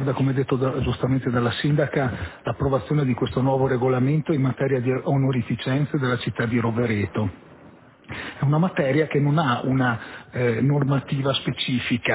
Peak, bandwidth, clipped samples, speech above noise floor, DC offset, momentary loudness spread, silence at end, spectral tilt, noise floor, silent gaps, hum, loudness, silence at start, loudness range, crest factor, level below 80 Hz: -8 dBFS; 4 kHz; under 0.1%; 26 dB; under 0.1%; 6 LU; 0 s; -11 dB/octave; -49 dBFS; none; none; -23 LUFS; 0 s; 2 LU; 14 dB; -46 dBFS